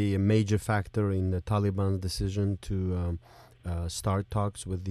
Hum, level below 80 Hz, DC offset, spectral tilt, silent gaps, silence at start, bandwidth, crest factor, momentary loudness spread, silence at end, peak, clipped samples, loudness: none; -46 dBFS; under 0.1%; -6.5 dB/octave; none; 0 s; 13 kHz; 14 dB; 10 LU; 0 s; -14 dBFS; under 0.1%; -30 LUFS